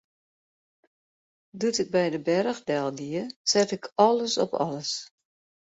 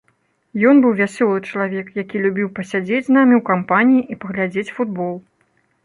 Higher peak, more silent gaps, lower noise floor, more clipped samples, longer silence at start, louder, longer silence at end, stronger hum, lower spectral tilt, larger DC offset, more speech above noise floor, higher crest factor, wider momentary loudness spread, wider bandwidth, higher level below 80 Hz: second, -6 dBFS vs -2 dBFS; first, 3.36-3.45 s vs none; first, under -90 dBFS vs -63 dBFS; neither; first, 1.55 s vs 0.55 s; second, -26 LUFS vs -17 LUFS; about the same, 0.65 s vs 0.65 s; neither; second, -3.5 dB/octave vs -7.5 dB/octave; neither; first, over 64 dB vs 47 dB; first, 22 dB vs 16 dB; second, 9 LU vs 12 LU; second, 8.2 kHz vs 11 kHz; second, -72 dBFS vs -64 dBFS